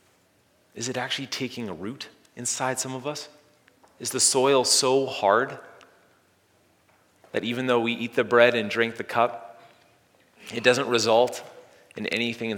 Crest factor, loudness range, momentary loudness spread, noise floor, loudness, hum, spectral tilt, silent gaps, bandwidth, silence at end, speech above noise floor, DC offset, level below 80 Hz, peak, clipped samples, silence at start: 24 dB; 7 LU; 17 LU; -63 dBFS; -24 LUFS; none; -2.5 dB/octave; none; 18.5 kHz; 0 s; 39 dB; under 0.1%; -76 dBFS; -2 dBFS; under 0.1%; 0.75 s